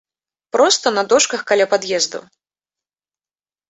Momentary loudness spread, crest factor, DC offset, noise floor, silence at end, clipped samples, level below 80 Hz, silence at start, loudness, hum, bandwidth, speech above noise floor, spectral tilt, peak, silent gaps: 8 LU; 18 dB; under 0.1%; under -90 dBFS; 1.5 s; under 0.1%; -64 dBFS; 0.55 s; -16 LUFS; none; 8.4 kHz; over 74 dB; -1 dB/octave; -2 dBFS; none